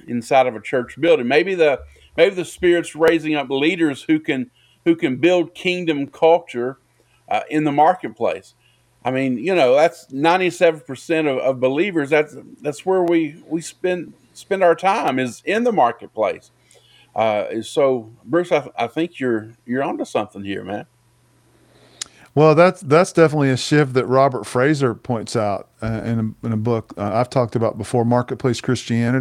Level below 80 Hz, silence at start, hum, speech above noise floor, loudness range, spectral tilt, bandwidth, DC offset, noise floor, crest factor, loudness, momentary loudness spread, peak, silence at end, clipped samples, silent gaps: -56 dBFS; 0.05 s; none; 39 dB; 5 LU; -6 dB/octave; 14 kHz; under 0.1%; -57 dBFS; 18 dB; -19 LUFS; 11 LU; 0 dBFS; 0 s; under 0.1%; none